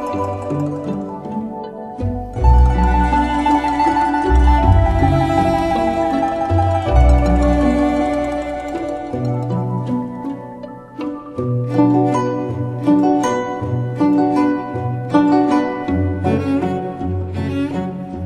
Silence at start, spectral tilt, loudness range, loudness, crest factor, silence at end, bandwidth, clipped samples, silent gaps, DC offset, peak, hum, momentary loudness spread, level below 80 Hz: 0 s; -8 dB/octave; 5 LU; -17 LUFS; 16 dB; 0 s; 9.8 kHz; under 0.1%; none; under 0.1%; 0 dBFS; none; 12 LU; -22 dBFS